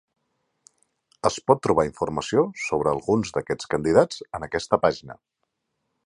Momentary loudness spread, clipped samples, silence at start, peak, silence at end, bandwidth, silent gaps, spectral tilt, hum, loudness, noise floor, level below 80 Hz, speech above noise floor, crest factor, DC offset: 9 LU; under 0.1%; 1.25 s; -2 dBFS; 0.95 s; 11 kHz; none; -5.5 dB/octave; none; -23 LUFS; -78 dBFS; -52 dBFS; 55 dB; 22 dB; under 0.1%